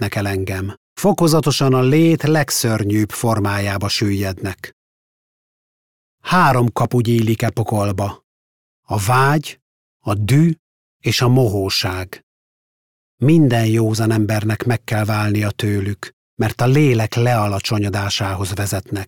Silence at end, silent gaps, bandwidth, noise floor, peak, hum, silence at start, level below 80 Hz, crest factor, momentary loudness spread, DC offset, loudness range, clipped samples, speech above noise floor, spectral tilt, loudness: 0 s; 0.77-0.96 s, 4.73-6.18 s, 8.24-8.83 s, 9.62-10.00 s, 10.59-11.00 s, 12.23-13.18 s, 16.13-16.37 s; 17.5 kHz; under -90 dBFS; -4 dBFS; none; 0 s; -50 dBFS; 14 dB; 11 LU; under 0.1%; 4 LU; under 0.1%; over 74 dB; -5.5 dB/octave; -17 LUFS